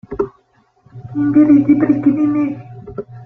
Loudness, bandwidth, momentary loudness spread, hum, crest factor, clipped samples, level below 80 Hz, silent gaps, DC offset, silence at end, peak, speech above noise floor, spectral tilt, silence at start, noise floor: -14 LUFS; 2.9 kHz; 20 LU; none; 14 dB; under 0.1%; -48 dBFS; none; under 0.1%; 0 s; -2 dBFS; 44 dB; -11 dB/octave; 0.1 s; -56 dBFS